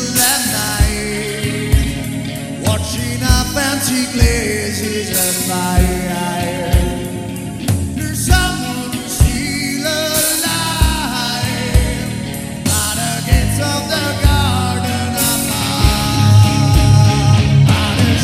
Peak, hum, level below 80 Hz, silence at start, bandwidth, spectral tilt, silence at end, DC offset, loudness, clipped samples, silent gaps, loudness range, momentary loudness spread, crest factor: 0 dBFS; none; -22 dBFS; 0 s; 16.5 kHz; -4 dB/octave; 0 s; under 0.1%; -15 LUFS; under 0.1%; none; 4 LU; 9 LU; 14 dB